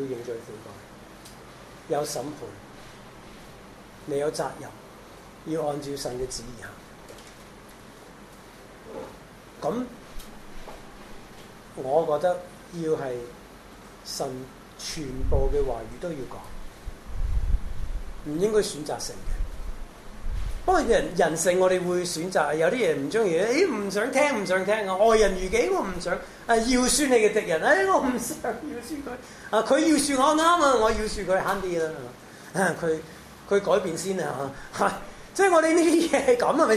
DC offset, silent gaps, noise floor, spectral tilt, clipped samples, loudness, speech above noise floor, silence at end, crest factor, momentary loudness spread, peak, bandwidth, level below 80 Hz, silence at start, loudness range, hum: under 0.1%; none; -47 dBFS; -4 dB/octave; under 0.1%; -25 LUFS; 22 dB; 0 s; 18 dB; 25 LU; -6 dBFS; 14 kHz; -38 dBFS; 0 s; 13 LU; none